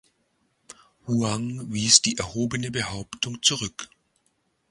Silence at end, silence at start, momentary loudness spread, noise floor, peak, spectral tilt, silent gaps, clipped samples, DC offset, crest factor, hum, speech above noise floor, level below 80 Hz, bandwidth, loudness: 0.85 s; 1.05 s; 16 LU; -71 dBFS; 0 dBFS; -2.5 dB/octave; none; under 0.1%; under 0.1%; 28 dB; none; 46 dB; -54 dBFS; 16 kHz; -23 LUFS